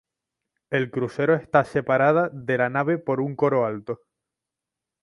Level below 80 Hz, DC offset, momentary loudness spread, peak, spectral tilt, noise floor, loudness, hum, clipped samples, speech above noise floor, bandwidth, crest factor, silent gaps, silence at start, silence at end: -64 dBFS; under 0.1%; 8 LU; -4 dBFS; -8 dB/octave; -87 dBFS; -23 LUFS; none; under 0.1%; 64 dB; 11 kHz; 20 dB; none; 0.7 s; 1.1 s